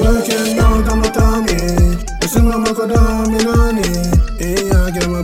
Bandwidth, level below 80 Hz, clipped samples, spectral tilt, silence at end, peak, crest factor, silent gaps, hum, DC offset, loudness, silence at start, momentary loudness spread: 16.5 kHz; -16 dBFS; under 0.1%; -5.5 dB/octave; 0 s; 0 dBFS; 12 dB; none; none; under 0.1%; -15 LUFS; 0 s; 3 LU